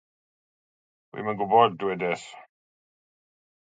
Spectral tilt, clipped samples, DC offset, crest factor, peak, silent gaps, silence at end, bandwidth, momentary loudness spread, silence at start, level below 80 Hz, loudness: -5.5 dB/octave; under 0.1%; under 0.1%; 24 dB; -4 dBFS; none; 1.25 s; 9.2 kHz; 19 LU; 1.15 s; -74 dBFS; -25 LUFS